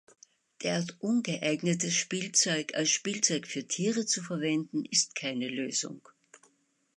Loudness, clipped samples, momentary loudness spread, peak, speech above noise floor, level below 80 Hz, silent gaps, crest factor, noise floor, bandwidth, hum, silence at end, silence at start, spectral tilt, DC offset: -29 LUFS; under 0.1%; 7 LU; -10 dBFS; 40 dB; -80 dBFS; none; 22 dB; -70 dBFS; 11.5 kHz; none; 0.6 s; 0.6 s; -2.5 dB/octave; under 0.1%